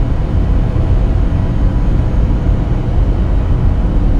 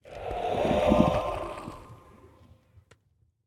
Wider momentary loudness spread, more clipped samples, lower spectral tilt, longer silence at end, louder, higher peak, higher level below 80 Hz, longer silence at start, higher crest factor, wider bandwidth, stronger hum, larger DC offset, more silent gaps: second, 1 LU vs 19 LU; neither; first, -9.5 dB/octave vs -7 dB/octave; second, 0 s vs 1.5 s; first, -15 LUFS vs -27 LUFS; first, -2 dBFS vs -6 dBFS; first, -14 dBFS vs -44 dBFS; about the same, 0 s vs 0.05 s; second, 10 dB vs 24 dB; second, 5 kHz vs 16 kHz; neither; neither; neither